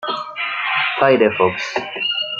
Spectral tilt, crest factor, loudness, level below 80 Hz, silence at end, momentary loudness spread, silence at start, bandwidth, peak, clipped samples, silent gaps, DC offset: -4.5 dB/octave; 18 dB; -18 LUFS; -64 dBFS; 0 s; 9 LU; 0 s; 7.6 kHz; -2 dBFS; under 0.1%; none; under 0.1%